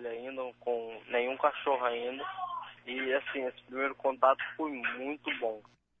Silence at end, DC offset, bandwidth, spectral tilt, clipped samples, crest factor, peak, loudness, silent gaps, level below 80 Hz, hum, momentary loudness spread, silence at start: 0.4 s; under 0.1%; 3.9 kHz; -5.5 dB/octave; under 0.1%; 22 dB; -12 dBFS; -33 LUFS; none; -78 dBFS; none; 11 LU; 0 s